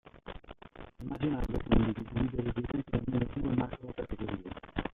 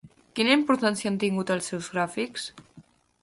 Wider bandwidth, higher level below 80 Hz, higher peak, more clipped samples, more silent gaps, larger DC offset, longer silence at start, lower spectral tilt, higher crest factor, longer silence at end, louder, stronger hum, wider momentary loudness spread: second, 5.4 kHz vs 11.5 kHz; first, -42 dBFS vs -68 dBFS; second, -12 dBFS vs -8 dBFS; neither; neither; neither; about the same, 0.05 s vs 0.05 s; first, -9.5 dB/octave vs -4 dB/octave; about the same, 22 dB vs 20 dB; second, 0 s vs 0.4 s; second, -34 LUFS vs -26 LUFS; neither; first, 19 LU vs 13 LU